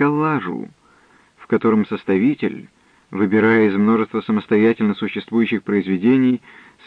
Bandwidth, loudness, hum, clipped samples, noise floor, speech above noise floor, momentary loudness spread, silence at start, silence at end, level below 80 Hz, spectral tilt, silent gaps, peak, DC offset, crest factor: 5 kHz; -18 LUFS; none; under 0.1%; -53 dBFS; 36 dB; 11 LU; 0 s; 0.5 s; -66 dBFS; -9 dB/octave; none; -4 dBFS; under 0.1%; 14 dB